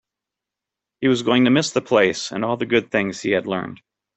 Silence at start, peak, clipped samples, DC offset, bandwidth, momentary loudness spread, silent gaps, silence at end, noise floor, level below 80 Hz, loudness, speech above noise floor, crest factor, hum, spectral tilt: 1 s; -2 dBFS; under 0.1%; under 0.1%; 8.4 kHz; 8 LU; none; 0.4 s; -86 dBFS; -60 dBFS; -20 LUFS; 66 dB; 18 dB; none; -4.5 dB/octave